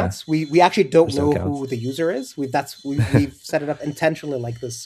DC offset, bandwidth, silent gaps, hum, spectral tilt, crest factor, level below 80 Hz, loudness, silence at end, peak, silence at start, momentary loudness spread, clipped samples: under 0.1%; 14 kHz; none; none; -6 dB/octave; 20 dB; -48 dBFS; -21 LUFS; 0 s; 0 dBFS; 0 s; 11 LU; under 0.1%